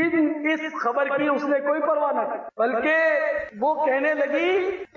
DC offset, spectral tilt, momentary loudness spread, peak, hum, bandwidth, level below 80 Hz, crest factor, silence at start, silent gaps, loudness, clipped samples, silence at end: under 0.1%; -5.5 dB/octave; 5 LU; -12 dBFS; none; 7 kHz; -64 dBFS; 12 dB; 0 s; none; -23 LUFS; under 0.1%; 0.1 s